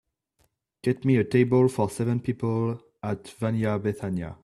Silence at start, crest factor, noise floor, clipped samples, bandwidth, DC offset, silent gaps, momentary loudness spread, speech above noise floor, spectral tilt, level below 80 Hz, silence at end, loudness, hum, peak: 0.85 s; 18 dB; -70 dBFS; under 0.1%; 12.5 kHz; under 0.1%; none; 11 LU; 46 dB; -8 dB/octave; -58 dBFS; 0.1 s; -26 LUFS; none; -8 dBFS